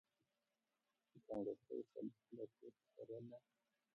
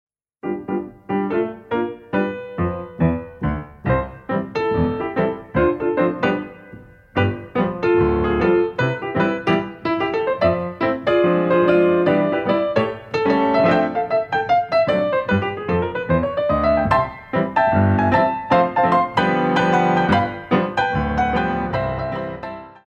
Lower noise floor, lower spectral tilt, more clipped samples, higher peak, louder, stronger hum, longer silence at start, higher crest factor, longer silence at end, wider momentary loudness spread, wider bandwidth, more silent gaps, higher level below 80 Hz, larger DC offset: first, under -90 dBFS vs -42 dBFS; first, -9.5 dB/octave vs -8 dB/octave; neither; second, -36 dBFS vs -2 dBFS; second, -53 LUFS vs -19 LUFS; neither; first, 1.15 s vs 0.45 s; about the same, 18 dB vs 16 dB; first, 0.55 s vs 0.15 s; first, 15 LU vs 9 LU; second, 5.8 kHz vs 7.6 kHz; neither; second, -88 dBFS vs -40 dBFS; neither